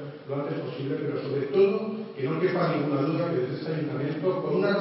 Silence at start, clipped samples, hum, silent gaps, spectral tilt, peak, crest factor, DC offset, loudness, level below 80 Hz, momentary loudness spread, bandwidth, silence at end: 0 s; under 0.1%; none; none; -11.5 dB/octave; -10 dBFS; 16 dB; under 0.1%; -28 LUFS; -76 dBFS; 9 LU; 5.8 kHz; 0 s